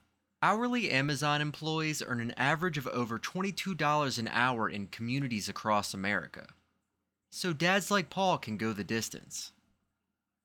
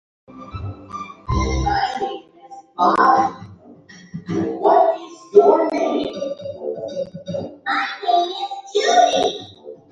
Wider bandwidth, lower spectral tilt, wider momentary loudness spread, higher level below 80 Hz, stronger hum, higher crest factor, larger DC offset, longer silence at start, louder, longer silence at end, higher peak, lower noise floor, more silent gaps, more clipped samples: first, 20 kHz vs 9.2 kHz; about the same, -4 dB/octave vs -5 dB/octave; second, 9 LU vs 18 LU; second, -70 dBFS vs -36 dBFS; neither; about the same, 20 dB vs 20 dB; neither; about the same, 0.4 s vs 0.3 s; second, -32 LUFS vs -19 LUFS; first, 0.95 s vs 0.15 s; second, -12 dBFS vs 0 dBFS; first, -86 dBFS vs -44 dBFS; neither; neither